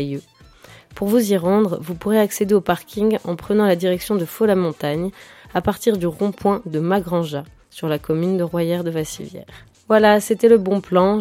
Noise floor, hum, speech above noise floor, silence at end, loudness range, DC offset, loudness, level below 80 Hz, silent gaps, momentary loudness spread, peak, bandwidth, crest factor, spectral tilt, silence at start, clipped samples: -46 dBFS; none; 27 dB; 0 s; 4 LU; under 0.1%; -19 LUFS; -50 dBFS; none; 12 LU; 0 dBFS; 16.5 kHz; 18 dB; -6 dB/octave; 0 s; under 0.1%